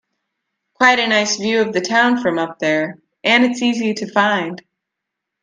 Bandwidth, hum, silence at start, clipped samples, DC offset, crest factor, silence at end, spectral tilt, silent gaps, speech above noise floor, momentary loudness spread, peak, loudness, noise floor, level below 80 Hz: 9.6 kHz; none; 0.8 s; under 0.1%; under 0.1%; 18 dB; 0.8 s; -3 dB/octave; none; 64 dB; 8 LU; 0 dBFS; -16 LUFS; -80 dBFS; -64 dBFS